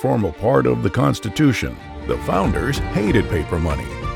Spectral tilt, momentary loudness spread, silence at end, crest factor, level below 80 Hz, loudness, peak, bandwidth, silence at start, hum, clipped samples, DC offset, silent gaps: -6.5 dB/octave; 8 LU; 0 s; 16 dB; -32 dBFS; -19 LUFS; -2 dBFS; 18 kHz; 0 s; none; under 0.1%; under 0.1%; none